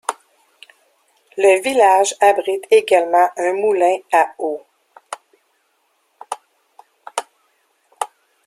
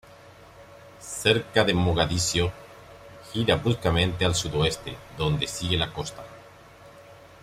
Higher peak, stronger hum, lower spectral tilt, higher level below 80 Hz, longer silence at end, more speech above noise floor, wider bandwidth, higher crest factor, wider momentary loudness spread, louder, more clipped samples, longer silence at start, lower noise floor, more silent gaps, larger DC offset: first, -2 dBFS vs -6 dBFS; neither; second, -1.5 dB/octave vs -4 dB/octave; second, -70 dBFS vs -46 dBFS; first, 0.4 s vs 0.15 s; first, 50 dB vs 24 dB; about the same, 14.5 kHz vs 15.5 kHz; about the same, 18 dB vs 22 dB; about the same, 20 LU vs 21 LU; first, -16 LUFS vs -25 LUFS; neither; about the same, 0.1 s vs 0.1 s; first, -64 dBFS vs -49 dBFS; neither; neither